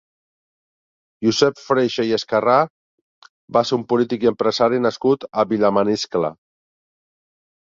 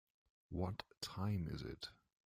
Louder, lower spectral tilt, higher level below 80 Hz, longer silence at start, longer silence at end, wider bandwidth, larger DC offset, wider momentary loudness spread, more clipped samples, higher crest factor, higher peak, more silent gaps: first, -19 LUFS vs -46 LUFS; about the same, -5 dB/octave vs -6 dB/octave; about the same, -60 dBFS vs -64 dBFS; first, 1.2 s vs 0.5 s; first, 1.35 s vs 0.3 s; second, 7.8 kHz vs 15.5 kHz; neither; second, 5 LU vs 9 LU; neither; about the same, 18 dB vs 20 dB; first, -2 dBFS vs -26 dBFS; first, 2.70-3.22 s, 3.29-3.48 s vs none